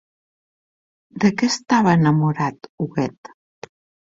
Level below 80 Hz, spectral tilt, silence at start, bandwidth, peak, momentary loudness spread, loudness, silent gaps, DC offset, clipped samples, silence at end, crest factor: -58 dBFS; -6 dB/octave; 1.15 s; 7.8 kHz; -2 dBFS; 12 LU; -19 LUFS; 2.69-2.78 s, 3.18-3.23 s; under 0.1%; under 0.1%; 0.85 s; 20 dB